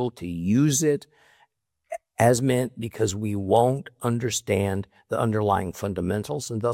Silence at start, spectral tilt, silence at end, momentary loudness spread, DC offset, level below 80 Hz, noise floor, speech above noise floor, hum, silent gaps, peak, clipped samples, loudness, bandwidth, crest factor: 0 s; -5.5 dB/octave; 0 s; 10 LU; under 0.1%; -58 dBFS; -66 dBFS; 42 dB; none; none; -6 dBFS; under 0.1%; -24 LUFS; 17 kHz; 20 dB